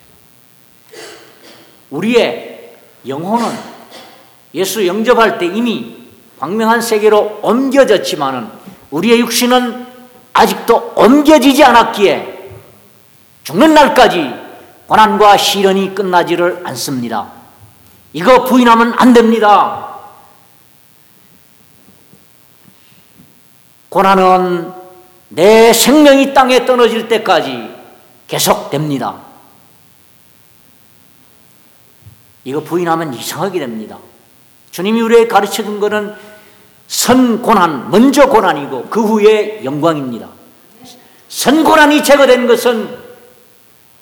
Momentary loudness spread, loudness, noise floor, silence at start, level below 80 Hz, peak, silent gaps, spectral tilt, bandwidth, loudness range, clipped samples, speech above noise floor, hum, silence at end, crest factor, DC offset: 19 LU; -10 LUFS; -46 dBFS; 0.95 s; -48 dBFS; 0 dBFS; none; -4 dB/octave; 19.5 kHz; 10 LU; 0.8%; 36 dB; none; 1 s; 12 dB; under 0.1%